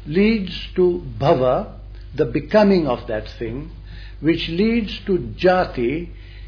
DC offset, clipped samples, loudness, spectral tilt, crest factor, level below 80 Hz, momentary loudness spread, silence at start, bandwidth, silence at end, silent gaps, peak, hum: under 0.1%; under 0.1%; -20 LUFS; -8 dB/octave; 16 dB; -36 dBFS; 17 LU; 0 s; 5.4 kHz; 0 s; none; -4 dBFS; none